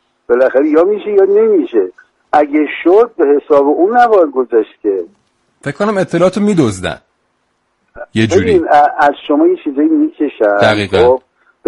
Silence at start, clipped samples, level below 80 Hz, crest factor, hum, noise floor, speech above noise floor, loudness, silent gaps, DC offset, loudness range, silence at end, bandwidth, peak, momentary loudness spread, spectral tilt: 0.3 s; under 0.1%; -46 dBFS; 12 dB; none; -62 dBFS; 52 dB; -11 LUFS; none; under 0.1%; 5 LU; 0.5 s; 11.5 kHz; 0 dBFS; 8 LU; -6.5 dB/octave